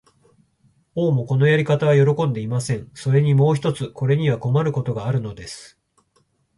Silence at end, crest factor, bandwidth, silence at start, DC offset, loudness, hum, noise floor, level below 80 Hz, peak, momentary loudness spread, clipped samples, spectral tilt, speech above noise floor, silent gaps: 0.9 s; 16 dB; 11.5 kHz; 0.95 s; under 0.1%; -20 LUFS; none; -64 dBFS; -54 dBFS; -6 dBFS; 11 LU; under 0.1%; -7.5 dB/octave; 45 dB; none